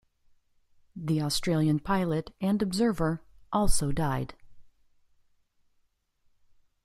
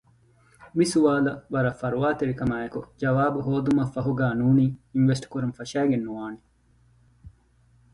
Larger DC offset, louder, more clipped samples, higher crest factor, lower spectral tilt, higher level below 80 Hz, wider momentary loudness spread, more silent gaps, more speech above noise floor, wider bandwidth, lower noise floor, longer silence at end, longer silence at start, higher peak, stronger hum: neither; second, -29 LUFS vs -25 LUFS; neither; about the same, 20 dB vs 18 dB; second, -5.5 dB/octave vs -7 dB/octave; first, -42 dBFS vs -54 dBFS; about the same, 10 LU vs 11 LU; neither; first, 45 dB vs 37 dB; first, 15 kHz vs 11.5 kHz; first, -72 dBFS vs -61 dBFS; first, 2.2 s vs 0.65 s; first, 0.95 s vs 0.6 s; about the same, -10 dBFS vs -8 dBFS; neither